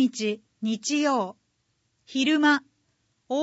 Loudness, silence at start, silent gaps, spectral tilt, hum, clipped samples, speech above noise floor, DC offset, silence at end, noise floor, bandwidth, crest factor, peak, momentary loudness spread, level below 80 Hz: -25 LUFS; 0 s; none; -3 dB/octave; none; under 0.1%; 49 dB; under 0.1%; 0 s; -73 dBFS; 8 kHz; 18 dB; -8 dBFS; 11 LU; -78 dBFS